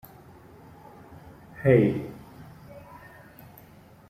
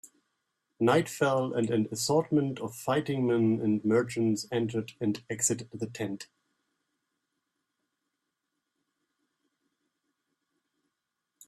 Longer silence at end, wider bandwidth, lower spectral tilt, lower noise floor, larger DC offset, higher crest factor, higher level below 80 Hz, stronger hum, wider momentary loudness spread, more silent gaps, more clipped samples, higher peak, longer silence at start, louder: second, 1.3 s vs 5.25 s; first, 15.5 kHz vs 14 kHz; first, -9.5 dB/octave vs -5 dB/octave; second, -52 dBFS vs -85 dBFS; neither; about the same, 22 dB vs 22 dB; first, -58 dBFS vs -72 dBFS; neither; first, 28 LU vs 10 LU; neither; neither; first, -6 dBFS vs -10 dBFS; first, 1.1 s vs 0.05 s; first, -23 LUFS vs -29 LUFS